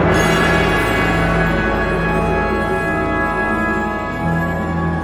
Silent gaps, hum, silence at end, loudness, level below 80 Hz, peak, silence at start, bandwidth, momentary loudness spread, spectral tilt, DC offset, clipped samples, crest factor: none; none; 0 s; -17 LUFS; -28 dBFS; -2 dBFS; 0 s; 16.5 kHz; 6 LU; -6 dB/octave; under 0.1%; under 0.1%; 14 dB